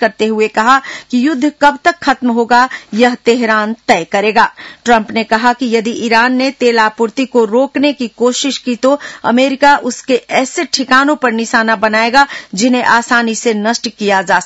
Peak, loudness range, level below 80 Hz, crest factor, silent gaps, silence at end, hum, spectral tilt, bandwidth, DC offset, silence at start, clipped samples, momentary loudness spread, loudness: 0 dBFS; 1 LU; -50 dBFS; 12 dB; none; 0 s; none; -3 dB/octave; 10 kHz; under 0.1%; 0 s; 0.4%; 5 LU; -12 LUFS